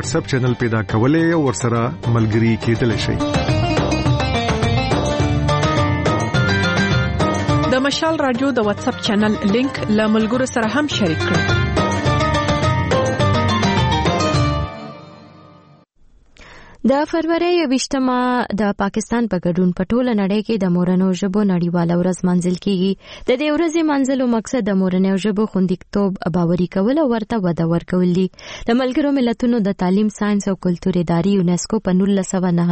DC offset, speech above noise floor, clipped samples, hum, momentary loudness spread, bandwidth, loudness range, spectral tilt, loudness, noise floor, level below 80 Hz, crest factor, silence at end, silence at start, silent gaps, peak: under 0.1%; 33 dB; under 0.1%; none; 3 LU; 8.8 kHz; 2 LU; -6 dB/octave; -18 LUFS; -50 dBFS; -36 dBFS; 14 dB; 0 s; 0 s; none; -4 dBFS